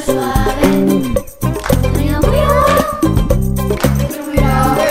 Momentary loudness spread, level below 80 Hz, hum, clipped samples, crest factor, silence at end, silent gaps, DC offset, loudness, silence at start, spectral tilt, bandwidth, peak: 6 LU; -20 dBFS; none; under 0.1%; 12 dB; 0 s; none; under 0.1%; -14 LUFS; 0 s; -6 dB/octave; 16.5 kHz; 0 dBFS